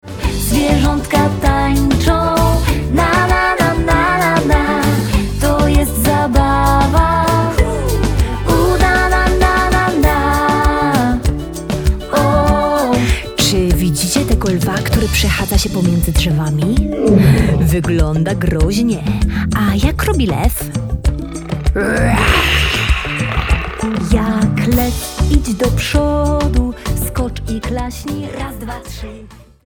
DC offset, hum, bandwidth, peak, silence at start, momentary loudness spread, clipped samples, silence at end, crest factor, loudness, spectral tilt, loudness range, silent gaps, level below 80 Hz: under 0.1%; none; over 20 kHz; 0 dBFS; 0.05 s; 8 LU; under 0.1%; 0.35 s; 14 dB; -14 LUFS; -5.5 dB/octave; 3 LU; none; -20 dBFS